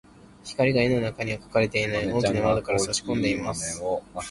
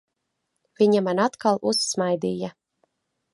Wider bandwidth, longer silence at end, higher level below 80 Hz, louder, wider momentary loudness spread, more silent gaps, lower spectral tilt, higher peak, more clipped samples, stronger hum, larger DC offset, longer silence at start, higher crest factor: about the same, 11.5 kHz vs 11.5 kHz; second, 0 s vs 0.85 s; first, -48 dBFS vs -70 dBFS; about the same, -25 LUFS vs -23 LUFS; about the same, 8 LU vs 9 LU; neither; about the same, -4.5 dB/octave vs -4.5 dB/octave; about the same, -8 dBFS vs -6 dBFS; neither; neither; neither; second, 0.45 s vs 0.8 s; about the same, 18 dB vs 18 dB